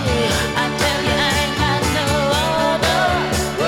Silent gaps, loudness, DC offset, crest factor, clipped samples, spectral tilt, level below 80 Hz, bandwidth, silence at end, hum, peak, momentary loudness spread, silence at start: none; -17 LUFS; under 0.1%; 14 dB; under 0.1%; -4 dB/octave; -32 dBFS; 17.5 kHz; 0 s; none; -4 dBFS; 2 LU; 0 s